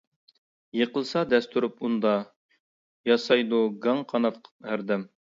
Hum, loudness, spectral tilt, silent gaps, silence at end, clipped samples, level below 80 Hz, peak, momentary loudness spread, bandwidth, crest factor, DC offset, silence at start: none; -26 LUFS; -6 dB/octave; 2.36-2.49 s, 2.60-3.04 s, 4.51-4.60 s; 0.35 s; under 0.1%; -74 dBFS; -8 dBFS; 11 LU; 7.6 kHz; 20 dB; under 0.1%; 0.75 s